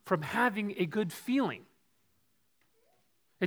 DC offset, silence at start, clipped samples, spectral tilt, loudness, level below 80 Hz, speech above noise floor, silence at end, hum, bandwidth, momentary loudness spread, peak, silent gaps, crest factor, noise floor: under 0.1%; 0.05 s; under 0.1%; -6 dB/octave; -32 LUFS; -78 dBFS; 44 dB; 0 s; none; over 20 kHz; 6 LU; -14 dBFS; none; 22 dB; -76 dBFS